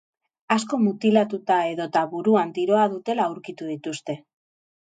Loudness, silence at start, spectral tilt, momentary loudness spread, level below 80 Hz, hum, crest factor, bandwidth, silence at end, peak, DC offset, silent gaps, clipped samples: -23 LUFS; 0.5 s; -5.5 dB/octave; 12 LU; -74 dBFS; none; 18 dB; 9.2 kHz; 0.7 s; -4 dBFS; under 0.1%; none; under 0.1%